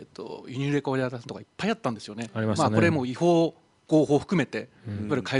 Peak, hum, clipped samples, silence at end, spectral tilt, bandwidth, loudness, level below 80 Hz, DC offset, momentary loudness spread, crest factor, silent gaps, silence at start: -6 dBFS; none; under 0.1%; 0 s; -6.5 dB/octave; 11 kHz; -26 LUFS; -62 dBFS; under 0.1%; 15 LU; 20 dB; none; 0 s